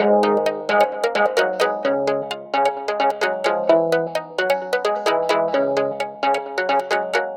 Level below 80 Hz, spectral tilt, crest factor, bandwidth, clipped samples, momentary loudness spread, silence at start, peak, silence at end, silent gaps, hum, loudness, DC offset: -68 dBFS; -4 dB/octave; 18 dB; 17 kHz; under 0.1%; 5 LU; 0 s; -2 dBFS; 0 s; none; none; -20 LUFS; under 0.1%